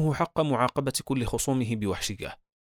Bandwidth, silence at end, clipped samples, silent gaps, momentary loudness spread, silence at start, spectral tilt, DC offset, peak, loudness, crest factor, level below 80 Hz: 19.5 kHz; 0.3 s; under 0.1%; none; 7 LU; 0 s; -5 dB/octave; under 0.1%; -10 dBFS; -28 LUFS; 18 dB; -46 dBFS